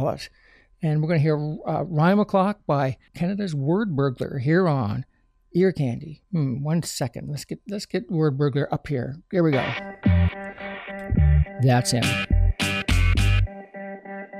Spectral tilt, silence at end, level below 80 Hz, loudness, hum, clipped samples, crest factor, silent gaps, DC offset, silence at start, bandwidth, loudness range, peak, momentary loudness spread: -6.5 dB/octave; 0 s; -32 dBFS; -23 LUFS; none; under 0.1%; 14 dB; none; under 0.1%; 0 s; 15 kHz; 4 LU; -10 dBFS; 13 LU